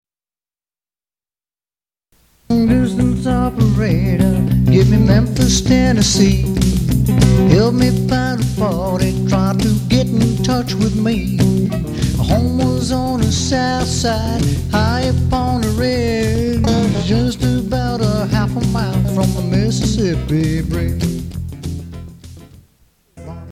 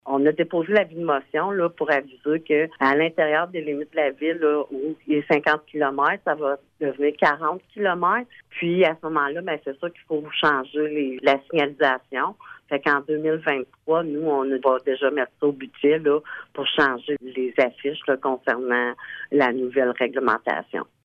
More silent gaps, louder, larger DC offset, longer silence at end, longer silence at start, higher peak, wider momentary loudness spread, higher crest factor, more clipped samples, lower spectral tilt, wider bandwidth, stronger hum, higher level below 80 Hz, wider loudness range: neither; first, -15 LUFS vs -23 LUFS; neither; second, 0 s vs 0.2 s; first, 2.5 s vs 0.05 s; first, 0 dBFS vs -6 dBFS; about the same, 7 LU vs 8 LU; about the same, 14 dB vs 18 dB; neither; about the same, -6 dB/octave vs -7 dB/octave; first, 15.5 kHz vs 6.6 kHz; neither; first, -26 dBFS vs -68 dBFS; first, 6 LU vs 1 LU